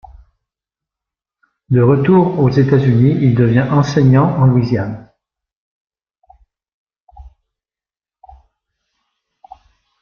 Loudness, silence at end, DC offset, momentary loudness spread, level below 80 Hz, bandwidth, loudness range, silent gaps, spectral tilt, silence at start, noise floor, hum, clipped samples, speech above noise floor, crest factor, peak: -13 LUFS; 2.75 s; under 0.1%; 7 LU; -46 dBFS; 6.8 kHz; 9 LU; 5.56-5.85 s, 6.74-6.87 s, 7.02-7.07 s; -9 dB/octave; 1.7 s; under -90 dBFS; none; under 0.1%; over 79 dB; 16 dB; 0 dBFS